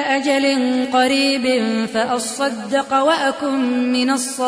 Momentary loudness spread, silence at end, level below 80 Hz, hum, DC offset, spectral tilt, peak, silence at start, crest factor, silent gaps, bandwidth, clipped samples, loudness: 5 LU; 0 s; -62 dBFS; none; under 0.1%; -2.5 dB/octave; -4 dBFS; 0 s; 14 dB; none; 11 kHz; under 0.1%; -18 LUFS